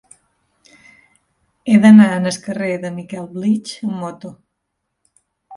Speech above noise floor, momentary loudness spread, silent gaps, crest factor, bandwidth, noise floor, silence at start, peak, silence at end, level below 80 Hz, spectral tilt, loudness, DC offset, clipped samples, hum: 60 dB; 21 LU; none; 18 dB; 11.5 kHz; -75 dBFS; 1.65 s; 0 dBFS; 0 s; -64 dBFS; -6.5 dB/octave; -15 LUFS; under 0.1%; under 0.1%; none